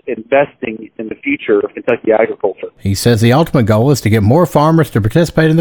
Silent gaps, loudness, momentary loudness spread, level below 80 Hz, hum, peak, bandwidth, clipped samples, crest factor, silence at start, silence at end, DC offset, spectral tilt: none; -13 LUFS; 11 LU; -38 dBFS; none; 0 dBFS; over 20 kHz; under 0.1%; 12 dB; 0.05 s; 0 s; under 0.1%; -6.5 dB/octave